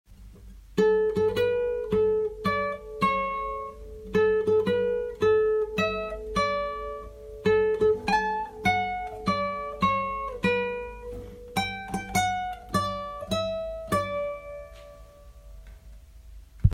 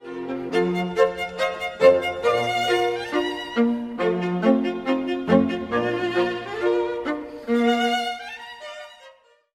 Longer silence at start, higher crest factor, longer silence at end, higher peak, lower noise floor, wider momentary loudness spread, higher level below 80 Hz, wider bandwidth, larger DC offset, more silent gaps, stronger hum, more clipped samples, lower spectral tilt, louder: about the same, 0.1 s vs 0 s; about the same, 22 dB vs 20 dB; second, 0 s vs 0.45 s; about the same, -6 dBFS vs -4 dBFS; second, -48 dBFS vs -52 dBFS; about the same, 13 LU vs 11 LU; first, -44 dBFS vs -58 dBFS; about the same, 16 kHz vs 15.5 kHz; neither; neither; neither; neither; about the same, -5.5 dB/octave vs -5.5 dB/octave; second, -27 LUFS vs -23 LUFS